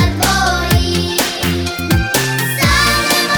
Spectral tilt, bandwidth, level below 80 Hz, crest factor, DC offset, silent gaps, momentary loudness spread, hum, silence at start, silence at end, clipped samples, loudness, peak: -3.5 dB/octave; over 20 kHz; -24 dBFS; 14 dB; under 0.1%; none; 5 LU; none; 0 s; 0 s; under 0.1%; -14 LUFS; 0 dBFS